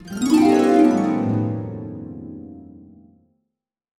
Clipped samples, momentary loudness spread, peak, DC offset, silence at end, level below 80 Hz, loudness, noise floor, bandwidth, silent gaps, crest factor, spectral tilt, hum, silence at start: under 0.1%; 22 LU; -4 dBFS; under 0.1%; 1.35 s; -56 dBFS; -18 LUFS; -80 dBFS; 13.5 kHz; none; 16 dB; -7 dB/octave; none; 0.05 s